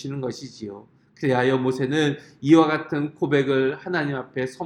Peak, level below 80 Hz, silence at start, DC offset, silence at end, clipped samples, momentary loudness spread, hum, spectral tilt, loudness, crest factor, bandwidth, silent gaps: -4 dBFS; -66 dBFS; 0 s; under 0.1%; 0 s; under 0.1%; 15 LU; none; -6.5 dB/octave; -22 LUFS; 18 dB; 11 kHz; none